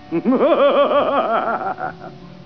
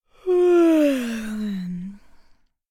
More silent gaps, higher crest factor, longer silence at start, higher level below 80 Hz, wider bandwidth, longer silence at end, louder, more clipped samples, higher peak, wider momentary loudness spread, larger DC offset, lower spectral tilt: neither; about the same, 14 dB vs 12 dB; second, 0 s vs 0.25 s; second, -58 dBFS vs -52 dBFS; second, 5.4 kHz vs 14.5 kHz; second, 0 s vs 0.75 s; first, -17 LUFS vs -20 LUFS; neither; first, -4 dBFS vs -10 dBFS; about the same, 15 LU vs 16 LU; first, 0.4% vs under 0.1%; first, -8 dB/octave vs -6.5 dB/octave